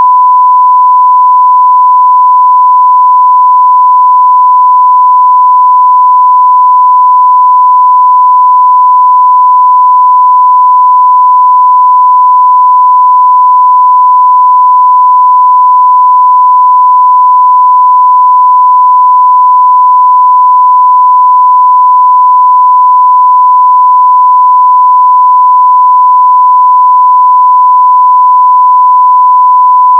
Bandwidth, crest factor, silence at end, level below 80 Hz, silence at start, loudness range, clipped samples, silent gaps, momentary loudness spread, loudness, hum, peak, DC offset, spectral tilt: 1.1 kHz; 4 dB; 0 s; under -90 dBFS; 0 s; 0 LU; 0.5%; none; 0 LU; -3 LUFS; none; 0 dBFS; under 0.1%; -5 dB/octave